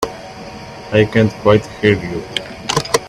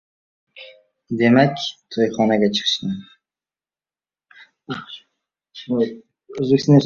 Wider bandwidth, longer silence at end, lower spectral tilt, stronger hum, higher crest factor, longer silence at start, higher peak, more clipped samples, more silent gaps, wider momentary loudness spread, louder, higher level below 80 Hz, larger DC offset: first, 16 kHz vs 7.4 kHz; about the same, 0 s vs 0 s; about the same, -5 dB/octave vs -6 dB/octave; neither; about the same, 16 dB vs 20 dB; second, 0 s vs 0.55 s; about the same, 0 dBFS vs -2 dBFS; neither; neither; second, 19 LU vs 24 LU; first, -16 LUFS vs -19 LUFS; first, -42 dBFS vs -60 dBFS; neither